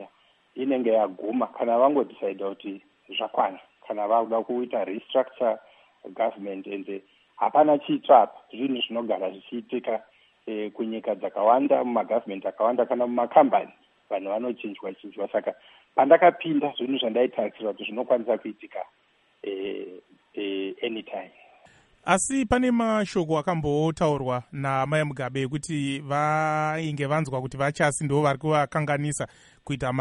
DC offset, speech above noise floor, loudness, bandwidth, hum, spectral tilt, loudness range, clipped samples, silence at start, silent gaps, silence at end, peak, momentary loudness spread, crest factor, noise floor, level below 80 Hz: under 0.1%; 35 dB; -25 LUFS; 11 kHz; none; -5.5 dB/octave; 6 LU; under 0.1%; 0 s; none; 0 s; -4 dBFS; 15 LU; 22 dB; -60 dBFS; -58 dBFS